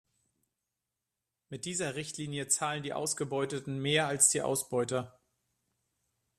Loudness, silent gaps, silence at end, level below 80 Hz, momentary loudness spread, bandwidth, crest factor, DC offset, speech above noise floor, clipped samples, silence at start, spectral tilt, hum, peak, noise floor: -31 LUFS; none; 1.3 s; -72 dBFS; 13 LU; 14 kHz; 24 dB; under 0.1%; 56 dB; under 0.1%; 1.5 s; -3 dB/octave; none; -12 dBFS; -88 dBFS